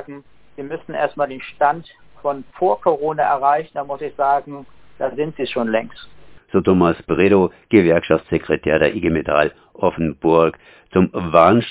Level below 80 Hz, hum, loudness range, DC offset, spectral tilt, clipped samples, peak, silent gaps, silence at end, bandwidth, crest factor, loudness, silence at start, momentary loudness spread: -44 dBFS; none; 5 LU; under 0.1%; -11 dB/octave; under 0.1%; 0 dBFS; none; 0 s; 4 kHz; 18 dB; -18 LUFS; 0 s; 13 LU